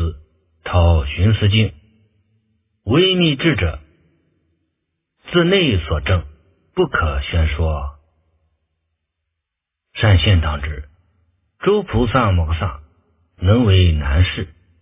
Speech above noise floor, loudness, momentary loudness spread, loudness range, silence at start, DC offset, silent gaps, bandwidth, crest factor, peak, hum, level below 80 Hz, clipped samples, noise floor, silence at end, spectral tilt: 65 dB; -17 LUFS; 14 LU; 5 LU; 0 s; under 0.1%; none; 3.8 kHz; 18 dB; 0 dBFS; none; -26 dBFS; under 0.1%; -80 dBFS; 0.35 s; -10.5 dB/octave